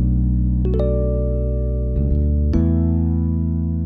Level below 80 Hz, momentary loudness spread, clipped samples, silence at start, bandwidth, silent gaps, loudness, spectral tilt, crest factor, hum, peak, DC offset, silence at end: -20 dBFS; 4 LU; under 0.1%; 0 s; 2.3 kHz; none; -20 LUFS; -12.5 dB/octave; 12 dB; none; -6 dBFS; under 0.1%; 0 s